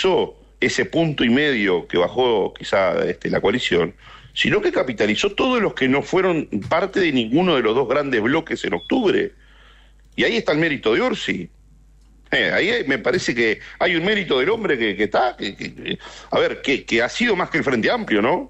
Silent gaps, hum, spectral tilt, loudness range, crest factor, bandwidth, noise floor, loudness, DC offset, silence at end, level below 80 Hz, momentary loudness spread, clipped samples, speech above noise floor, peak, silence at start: none; none; -5 dB/octave; 2 LU; 12 dB; 8.4 kHz; -50 dBFS; -20 LUFS; under 0.1%; 0 s; -48 dBFS; 6 LU; under 0.1%; 30 dB; -8 dBFS; 0 s